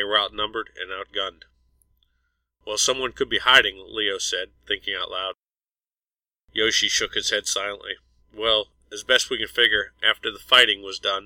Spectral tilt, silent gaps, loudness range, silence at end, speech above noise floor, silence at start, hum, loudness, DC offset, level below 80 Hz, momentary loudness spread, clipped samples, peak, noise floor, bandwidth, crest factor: 0 dB/octave; none; 6 LU; 0 s; over 67 dB; 0 s; none; -21 LUFS; under 0.1%; -54 dBFS; 16 LU; under 0.1%; -2 dBFS; under -90 dBFS; 16.5 kHz; 22 dB